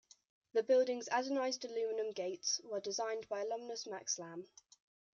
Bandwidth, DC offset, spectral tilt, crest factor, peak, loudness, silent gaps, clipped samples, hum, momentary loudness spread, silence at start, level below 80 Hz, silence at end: 7.6 kHz; under 0.1%; -1.5 dB/octave; 18 dB; -22 dBFS; -38 LUFS; none; under 0.1%; none; 10 LU; 0.55 s; -90 dBFS; 0.7 s